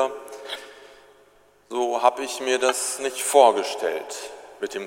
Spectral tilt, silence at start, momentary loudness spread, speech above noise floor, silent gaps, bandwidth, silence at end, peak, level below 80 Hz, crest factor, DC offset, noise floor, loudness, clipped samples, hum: -0.5 dB/octave; 0 s; 18 LU; 35 dB; none; 16.5 kHz; 0 s; -2 dBFS; -72 dBFS; 22 dB; under 0.1%; -57 dBFS; -22 LUFS; under 0.1%; 50 Hz at -75 dBFS